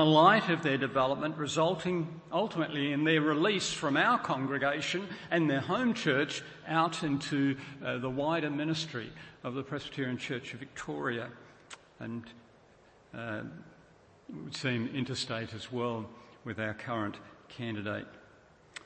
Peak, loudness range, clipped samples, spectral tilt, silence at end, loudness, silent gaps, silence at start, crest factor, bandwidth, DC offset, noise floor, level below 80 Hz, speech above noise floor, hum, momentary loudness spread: -10 dBFS; 11 LU; under 0.1%; -5 dB/octave; 0.05 s; -32 LUFS; none; 0 s; 22 dB; 8.8 kHz; under 0.1%; -61 dBFS; -68 dBFS; 29 dB; none; 16 LU